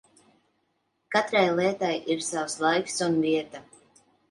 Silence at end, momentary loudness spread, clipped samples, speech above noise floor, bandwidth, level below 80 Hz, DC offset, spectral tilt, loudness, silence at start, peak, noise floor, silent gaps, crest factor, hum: 0.7 s; 7 LU; under 0.1%; 49 dB; 11.5 kHz; -72 dBFS; under 0.1%; -4 dB/octave; -26 LUFS; 1.1 s; -8 dBFS; -74 dBFS; none; 20 dB; none